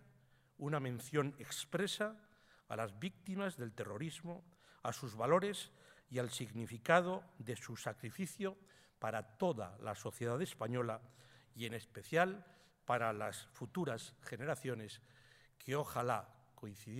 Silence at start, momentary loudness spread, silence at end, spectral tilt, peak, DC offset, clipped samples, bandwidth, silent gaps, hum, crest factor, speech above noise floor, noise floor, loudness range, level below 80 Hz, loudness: 0.6 s; 14 LU; 0 s; -5 dB/octave; -16 dBFS; under 0.1%; under 0.1%; 16 kHz; none; none; 26 dB; 29 dB; -70 dBFS; 5 LU; -80 dBFS; -41 LUFS